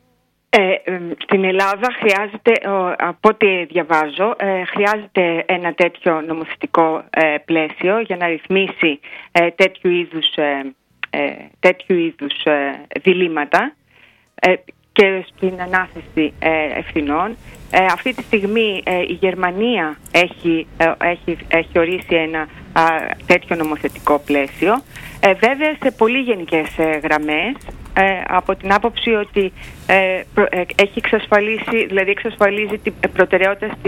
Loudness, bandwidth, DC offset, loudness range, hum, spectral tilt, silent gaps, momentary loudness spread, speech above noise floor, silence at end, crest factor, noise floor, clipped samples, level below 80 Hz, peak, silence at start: -17 LUFS; 16.5 kHz; under 0.1%; 2 LU; none; -5.5 dB/octave; none; 7 LU; 45 dB; 0 s; 18 dB; -62 dBFS; under 0.1%; -46 dBFS; 0 dBFS; 0.55 s